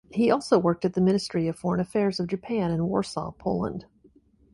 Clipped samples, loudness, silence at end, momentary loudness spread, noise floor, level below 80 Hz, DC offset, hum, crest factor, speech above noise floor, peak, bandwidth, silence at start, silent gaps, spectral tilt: under 0.1%; -26 LUFS; 0.7 s; 9 LU; -59 dBFS; -54 dBFS; under 0.1%; none; 16 dB; 34 dB; -8 dBFS; 11.5 kHz; 0.1 s; none; -7 dB/octave